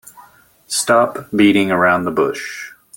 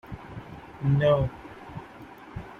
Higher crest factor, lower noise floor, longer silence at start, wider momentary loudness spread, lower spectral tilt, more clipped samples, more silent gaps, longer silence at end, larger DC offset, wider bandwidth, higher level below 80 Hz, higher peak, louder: about the same, 16 dB vs 20 dB; about the same, -48 dBFS vs -46 dBFS; first, 0.2 s vs 0.05 s; second, 13 LU vs 22 LU; second, -4 dB/octave vs -9 dB/octave; neither; neither; first, 0.25 s vs 0 s; neither; first, 17 kHz vs 4.8 kHz; second, -58 dBFS vs -48 dBFS; first, -2 dBFS vs -10 dBFS; first, -15 LUFS vs -25 LUFS